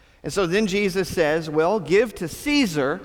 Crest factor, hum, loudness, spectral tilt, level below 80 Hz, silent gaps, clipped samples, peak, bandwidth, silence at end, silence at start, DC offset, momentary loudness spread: 14 dB; none; -22 LUFS; -5 dB/octave; -48 dBFS; none; under 0.1%; -8 dBFS; 19 kHz; 0 s; 0.25 s; under 0.1%; 6 LU